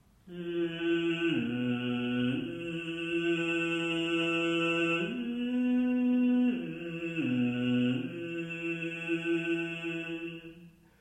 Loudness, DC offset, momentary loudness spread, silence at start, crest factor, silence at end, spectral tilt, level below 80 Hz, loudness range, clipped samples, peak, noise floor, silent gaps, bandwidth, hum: -31 LUFS; under 0.1%; 9 LU; 0.25 s; 12 dB; 0.3 s; -6 dB/octave; -68 dBFS; 3 LU; under 0.1%; -18 dBFS; -54 dBFS; none; 9.2 kHz; none